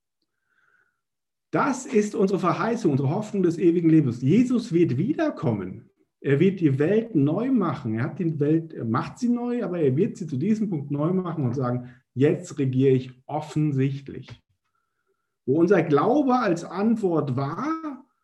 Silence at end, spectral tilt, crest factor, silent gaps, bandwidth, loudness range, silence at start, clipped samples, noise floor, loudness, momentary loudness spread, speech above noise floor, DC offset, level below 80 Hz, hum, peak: 0.25 s; -8 dB/octave; 18 dB; none; 10.5 kHz; 4 LU; 1.55 s; under 0.1%; -89 dBFS; -24 LUFS; 9 LU; 66 dB; under 0.1%; -66 dBFS; none; -6 dBFS